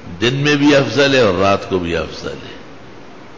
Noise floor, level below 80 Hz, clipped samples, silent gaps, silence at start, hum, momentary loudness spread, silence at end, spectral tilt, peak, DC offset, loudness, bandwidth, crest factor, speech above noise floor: -38 dBFS; -40 dBFS; under 0.1%; none; 0 s; none; 18 LU; 0 s; -5 dB/octave; -2 dBFS; 1%; -14 LUFS; 7.6 kHz; 14 dB; 23 dB